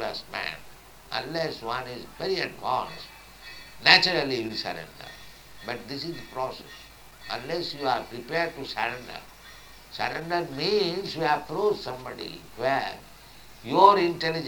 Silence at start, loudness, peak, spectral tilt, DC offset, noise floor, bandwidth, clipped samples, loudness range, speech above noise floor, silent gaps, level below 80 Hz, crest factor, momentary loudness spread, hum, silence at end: 0 s; -26 LUFS; 0 dBFS; -4 dB/octave; under 0.1%; -48 dBFS; 19.5 kHz; under 0.1%; 8 LU; 21 dB; none; -56 dBFS; 28 dB; 25 LU; none; 0 s